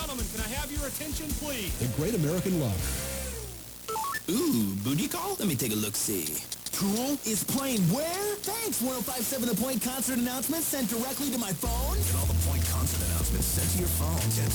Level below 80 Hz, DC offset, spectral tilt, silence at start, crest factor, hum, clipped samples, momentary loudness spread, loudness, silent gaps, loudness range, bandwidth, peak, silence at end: -38 dBFS; under 0.1%; -4 dB/octave; 0 s; 12 dB; none; under 0.1%; 6 LU; -29 LUFS; none; 3 LU; over 20 kHz; -16 dBFS; 0 s